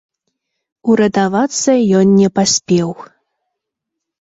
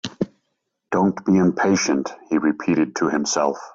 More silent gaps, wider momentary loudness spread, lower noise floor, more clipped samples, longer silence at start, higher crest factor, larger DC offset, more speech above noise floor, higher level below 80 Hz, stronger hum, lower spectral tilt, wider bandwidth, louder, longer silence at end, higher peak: neither; about the same, 9 LU vs 7 LU; first, -79 dBFS vs -75 dBFS; neither; first, 0.85 s vs 0.05 s; about the same, 14 dB vs 16 dB; neither; first, 66 dB vs 55 dB; first, -54 dBFS vs -60 dBFS; neither; about the same, -5 dB/octave vs -5 dB/octave; about the same, 8 kHz vs 7.8 kHz; first, -13 LUFS vs -21 LUFS; first, 1.25 s vs 0.05 s; first, -2 dBFS vs -6 dBFS